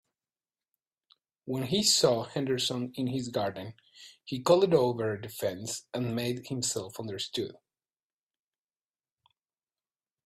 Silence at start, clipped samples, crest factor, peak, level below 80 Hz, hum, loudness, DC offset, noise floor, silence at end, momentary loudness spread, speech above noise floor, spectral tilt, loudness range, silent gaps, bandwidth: 1.45 s; under 0.1%; 22 dB; -10 dBFS; -68 dBFS; none; -29 LUFS; under 0.1%; under -90 dBFS; 2.75 s; 15 LU; over 60 dB; -4 dB/octave; 9 LU; none; 16 kHz